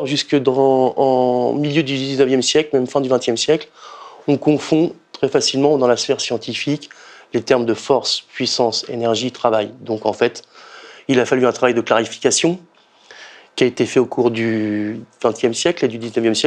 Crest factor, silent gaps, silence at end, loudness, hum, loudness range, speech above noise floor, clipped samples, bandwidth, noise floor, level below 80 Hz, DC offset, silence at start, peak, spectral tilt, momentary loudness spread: 18 dB; none; 0 s; -17 LUFS; none; 3 LU; 29 dB; under 0.1%; 10.5 kHz; -46 dBFS; -64 dBFS; under 0.1%; 0 s; 0 dBFS; -4 dB/octave; 8 LU